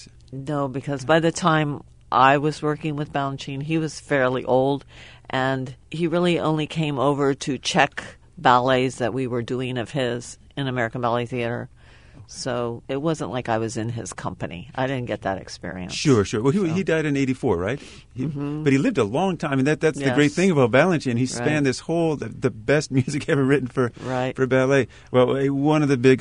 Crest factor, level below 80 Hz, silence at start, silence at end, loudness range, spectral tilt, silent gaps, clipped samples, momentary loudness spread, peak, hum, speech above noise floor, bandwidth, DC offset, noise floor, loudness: 20 dB; -52 dBFS; 0 s; 0 s; 7 LU; -6 dB/octave; none; under 0.1%; 12 LU; -2 dBFS; none; 25 dB; 11 kHz; 0.1%; -47 dBFS; -22 LUFS